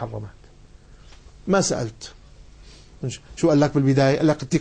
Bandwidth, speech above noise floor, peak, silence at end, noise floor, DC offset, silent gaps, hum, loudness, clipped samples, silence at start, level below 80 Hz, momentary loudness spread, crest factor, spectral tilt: 9.8 kHz; 27 dB; -8 dBFS; 0 s; -47 dBFS; under 0.1%; none; none; -21 LUFS; under 0.1%; 0 s; -48 dBFS; 20 LU; 16 dB; -6 dB/octave